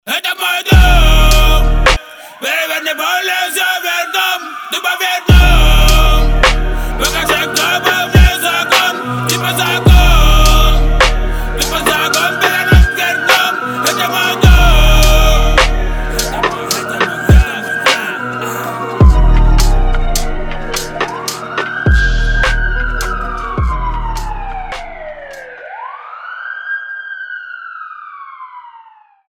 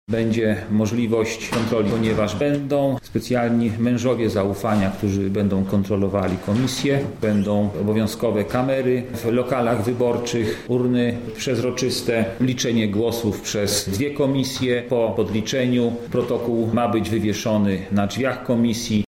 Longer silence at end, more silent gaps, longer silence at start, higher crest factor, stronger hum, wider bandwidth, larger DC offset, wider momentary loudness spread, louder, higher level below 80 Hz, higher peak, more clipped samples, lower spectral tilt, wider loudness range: first, 0.6 s vs 0.05 s; neither; about the same, 0.05 s vs 0.1 s; about the same, 12 dB vs 14 dB; neither; first, 19.5 kHz vs 16.5 kHz; neither; first, 16 LU vs 3 LU; first, -12 LUFS vs -21 LUFS; first, -14 dBFS vs -46 dBFS; first, 0 dBFS vs -8 dBFS; first, 0.1% vs under 0.1%; second, -4 dB/octave vs -5.5 dB/octave; first, 12 LU vs 1 LU